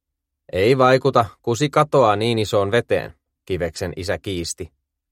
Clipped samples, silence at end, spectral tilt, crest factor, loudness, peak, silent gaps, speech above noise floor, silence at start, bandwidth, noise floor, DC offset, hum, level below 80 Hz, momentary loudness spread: under 0.1%; 0.45 s; -5.5 dB/octave; 18 dB; -19 LUFS; -2 dBFS; none; 35 dB; 0.55 s; 16 kHz; -54 dBFS; under 0.1%; none; -48 dBFS; 14 LU